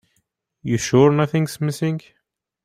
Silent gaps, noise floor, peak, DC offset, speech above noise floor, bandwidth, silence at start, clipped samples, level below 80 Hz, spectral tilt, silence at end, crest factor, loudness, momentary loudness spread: none; -70 dBFS; -2 dBFS; under 0.1%; 52 dB; 15.5 kHz; 0.65 s; under 0.1%; -56 dBFS; -6.5 dB/octave; 0.65 s; 18 dB; -19 LUFS; 12 LU